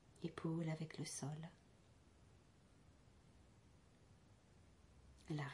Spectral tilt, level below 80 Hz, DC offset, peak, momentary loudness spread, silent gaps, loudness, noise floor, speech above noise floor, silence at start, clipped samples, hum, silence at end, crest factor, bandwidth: -5.5 dB/octave; -74 dBFS; under 0.1%; -30 dBFS; 25 LU; none; -48 LUFS; -70 dBFS; 23 dB; 0.1 s; under 0.1%; none; 0 s; 22 dB; 11.5 kHz